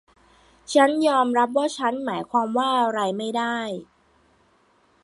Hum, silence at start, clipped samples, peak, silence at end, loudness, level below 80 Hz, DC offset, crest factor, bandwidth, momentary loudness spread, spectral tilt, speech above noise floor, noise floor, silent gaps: none; 0.7 s; under 0.1%; -4 dBFS; 1.2 s; -22 LUFS; -68 dBFS; under 0.1%; 20 dB; 11.5 kHz; 9 LU; -4 dB/octave; 39 dB; -61 dBFS; none